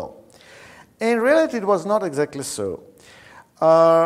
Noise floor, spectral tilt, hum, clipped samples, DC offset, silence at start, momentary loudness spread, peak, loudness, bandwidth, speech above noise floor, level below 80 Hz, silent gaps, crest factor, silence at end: -46 dBFS; -5 dB/octave; none; under 0.1%; under 0.1%; 0 s; 13 LU; -2 dBFS; -20 LUFS; 14.5 kHz; 28 dB; -62 dBFS; none; 18 dB; 0 s